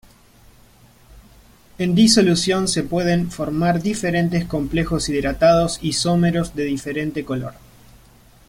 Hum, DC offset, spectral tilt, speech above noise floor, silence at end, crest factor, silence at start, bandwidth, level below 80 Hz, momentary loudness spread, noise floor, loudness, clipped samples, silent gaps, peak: none; under 0.1%; -5 dB/octave; 31 dB; 0.95 s; 18 dB; 1.15 s; 16 kHz; -40 dBFS; 10 LU; -50 dBFS; -19 LUFS; under 0.1%; none; -2 dBFS